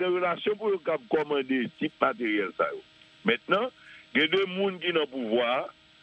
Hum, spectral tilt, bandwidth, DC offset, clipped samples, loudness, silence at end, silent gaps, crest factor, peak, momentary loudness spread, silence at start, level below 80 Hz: none; -6.5 dB/octave; 8.2 kHz; under 0.1%; under 0.1%; -28 LUFS; 0.3 s; none; 20 dB; -8 dBFS; 6 LU; 0 s; -72 dBFS